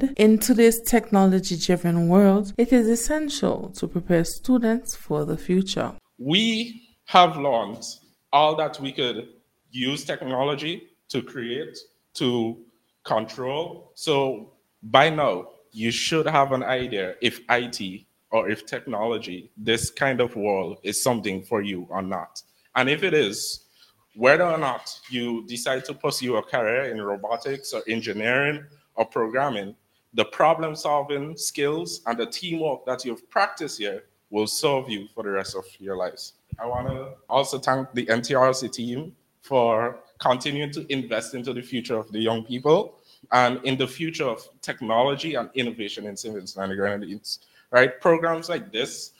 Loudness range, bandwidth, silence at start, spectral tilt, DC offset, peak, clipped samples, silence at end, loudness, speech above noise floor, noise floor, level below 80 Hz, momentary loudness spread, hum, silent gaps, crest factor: 6 LU; 17.5 kHz; 0 s; -4.5 dB/octave; under 0.1%; 0 dBFS; under 0.1%; 0.1 s; -24 LUFS; 36 dB; -59 dBFS; -52 dBFS; 14 LU; none; none; 24 dB